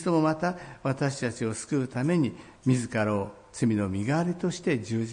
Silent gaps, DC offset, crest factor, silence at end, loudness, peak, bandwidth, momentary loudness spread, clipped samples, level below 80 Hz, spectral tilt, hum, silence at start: none; under 0.1%; 16 dB; 0 s; -28 LUFS; -12 dBFS; 10.5 kHz; 6 LU; under 0.1%; -62 dBFS; -6.5 dB/octave; none; 0 s